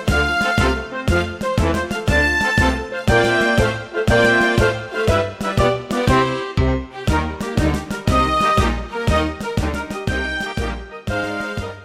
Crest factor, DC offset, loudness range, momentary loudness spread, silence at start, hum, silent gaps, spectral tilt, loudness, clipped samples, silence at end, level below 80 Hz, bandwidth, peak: 16 dB; under 0.1%; 3 LU; 8 LU; 0 s; none; none; -5.5 dB/octave; -19 LUFS; under 0.1%; 0 s; -28 dBFS; 15.5 kHz; -2 dBFS